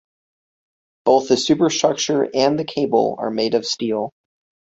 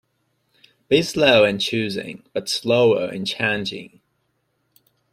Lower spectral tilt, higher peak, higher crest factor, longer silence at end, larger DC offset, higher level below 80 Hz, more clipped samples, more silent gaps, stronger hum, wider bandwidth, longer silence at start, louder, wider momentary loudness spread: about the same, -4 dB/octave vs -4.5 dB/octave; about the same, -2 dBFS vs -2 dBFS; about the same, 18 dB vs 20 dB; second, 0.6 s vs 1.25 s; neither; about the same, -60 dBFS vs -58 dBFS; neither; neither; neither; second, 8 kHz vs 15.5 kHz; first, 1.05 s vs 0.9 s; about the same, -19 LUFS vs -20 LUFS; second, 7 LU vs 14 LU